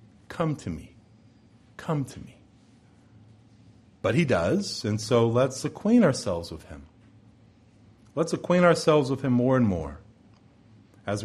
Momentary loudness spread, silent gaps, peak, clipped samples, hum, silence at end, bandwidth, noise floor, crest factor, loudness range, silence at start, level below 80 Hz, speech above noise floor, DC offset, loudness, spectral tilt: 19 LU; none; -6 dBFS; under 0.1%; none; 0 s; 12.5 kHz; -56 dBFS; 22 dB; 10 LU; 0.3 s; -54 dBFS; 32 dB; under 0.1%; -25 LUFS; -6 dB/octave